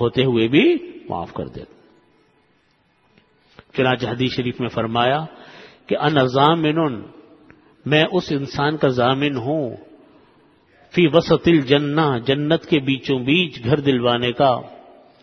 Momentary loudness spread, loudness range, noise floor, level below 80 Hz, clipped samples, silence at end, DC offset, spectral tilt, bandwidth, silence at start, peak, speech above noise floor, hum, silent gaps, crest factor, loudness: 13 LU; 7 LU; -61 dBFS; -52 dBFS; under 0.1%; 0.45 s; under 0.1%; -7 dB/octave; 6.4 kHz; 0 s; 0 dBFS; 43 dB; none; none; 20 dB; -19 LUFS